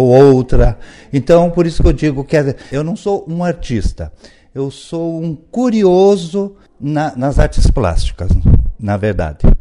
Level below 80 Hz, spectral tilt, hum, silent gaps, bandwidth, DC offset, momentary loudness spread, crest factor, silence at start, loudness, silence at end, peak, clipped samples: -18 dBFS; -7.5 dB/octave; none; none; 11 kHz; under 0.1%; 13 LU; 12 dB; 0 s; -14 LUFS; 0 s; 0 dBFS; 0.3%